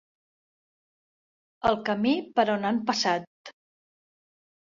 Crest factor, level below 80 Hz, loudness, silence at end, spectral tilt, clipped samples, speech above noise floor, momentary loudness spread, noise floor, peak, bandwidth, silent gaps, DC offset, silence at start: 20 dB; -64 dBFS; -26 LUFS; 1.2 s; -4.5 dB/octave; under 0.1%; over 65 dB; 4 LU; under -90 dBFS; -10 dBFS; 7.6 kHz; 3.27-3.44 s; under 0.1%; 1.65 s